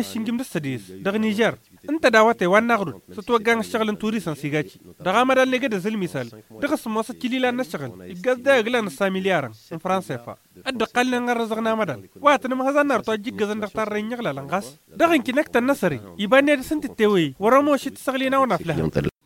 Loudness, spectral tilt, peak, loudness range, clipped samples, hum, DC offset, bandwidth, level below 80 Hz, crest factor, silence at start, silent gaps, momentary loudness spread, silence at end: -22 LUFS; -5 dB/octave; -2 dBFS; 4 LU; under 0.1%; none; under 0.1%; 17 kHz; -54 dBFS; 20 dB; 0 s; none; 12 LU; 0.15 s